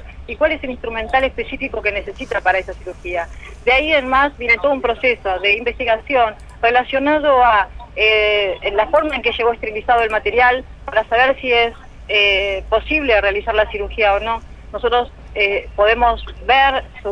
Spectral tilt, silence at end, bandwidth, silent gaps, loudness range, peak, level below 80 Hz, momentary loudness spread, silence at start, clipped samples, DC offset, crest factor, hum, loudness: -5 dB/octave; 0 s; 10 kHz; none; 3 LU; -2 dBFS; -36 dBFS; 11 LU; 0 s; under 0.1%; under 0.1%; 16 dB; none; -16 LUFS